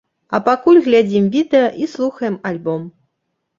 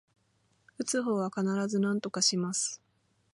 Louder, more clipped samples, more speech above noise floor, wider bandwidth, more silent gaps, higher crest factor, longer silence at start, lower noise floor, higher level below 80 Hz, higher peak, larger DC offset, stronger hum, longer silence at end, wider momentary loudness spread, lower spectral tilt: first, -16 LUFS vs -30 LUFS; neither; first, 58 dB vs 41 dB; second, 7.4 kHz vs 11.5 kHz; neither; about the same, 14 dB vs 18 dB; second, 0.3 s vs 0.8 s; about the same, -73 dBFS vs -72 dBFS; first, -60 dBFS vs -80 dBFS; first, -2 dBFS vs -14 dBFS; neither; neither; about the same, 0.7 s vs 0.6 s; first, 12 LU vs 7 LU; first, -7 dB/octave vs -3.5 dB/octave